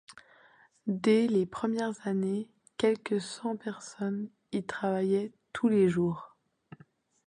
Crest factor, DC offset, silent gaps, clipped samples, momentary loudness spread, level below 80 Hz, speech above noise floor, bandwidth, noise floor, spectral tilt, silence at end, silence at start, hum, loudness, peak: 18 dB; under 0.1%; none; under 0.1%; 12 LU; -70 dBFS; 32 dB; 10.5 kHz; -62 dBFS; -6.5 dB/octave; 1 s; 0.1 s; none; -31 LUFS; -14 dBFS